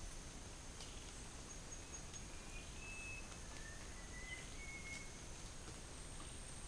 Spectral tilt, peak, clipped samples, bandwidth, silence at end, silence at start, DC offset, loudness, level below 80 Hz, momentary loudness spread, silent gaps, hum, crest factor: -2.5 dB/octave; -32 dBFS; under 0.1%; 10.5 kHz; 0 s; 0 s; under 0.1%; -52 LUFS; -56 dBFS; 4 LU; none; none; 18 dB